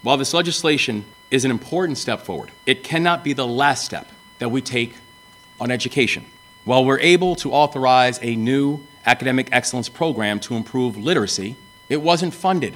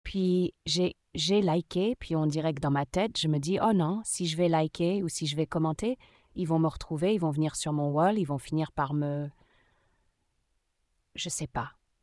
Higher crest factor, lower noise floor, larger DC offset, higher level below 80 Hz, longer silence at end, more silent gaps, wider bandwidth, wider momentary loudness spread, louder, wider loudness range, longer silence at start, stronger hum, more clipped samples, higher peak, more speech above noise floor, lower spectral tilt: about the same, 20 dB vs 16 dB; second, -47 dBFS vs -76 dBFS; neither; about the same, -58 dBFS vs -54 dBFS; second, 0 s vs 0.35 s; neither; first, 18 kHz vs 12 kHz; about the same, 10 LU vs 8 LU; first, -19 LUFS vs -29 LUFS; about the same, 5 LU vs 7 LU; about the same, 0.05 s vs 0.05 s; neither; neither; first, 0 dBFS vs -14 dBFS; second, 28 dB vs 47 dB; second, -4 dB/octave vs -5.5 dB/octave